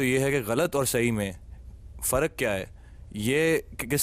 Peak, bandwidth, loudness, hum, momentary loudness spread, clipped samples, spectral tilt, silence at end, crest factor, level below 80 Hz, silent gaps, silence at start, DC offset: -12 dBFS; 15.5 kHz; -26 LUFS; none; 20 LU; under 0.1%; -4.5 dB/octave; 0 s; 16 dB; -46 dBFS; none; 0 s; under 0.1%